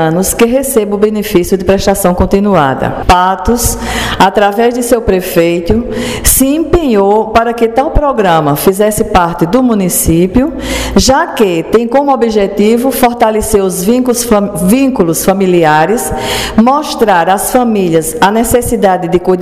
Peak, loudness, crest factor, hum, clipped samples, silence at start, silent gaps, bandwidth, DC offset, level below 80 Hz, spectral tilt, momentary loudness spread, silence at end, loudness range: 0 dBFS; -9 LUFS; 10 dB; none; 0.6%; 0 s; none; 16.5 kHz; 0.5%; -24 dBFS; -4.5 dB/octave; 3 LU; 0 s; 1 LU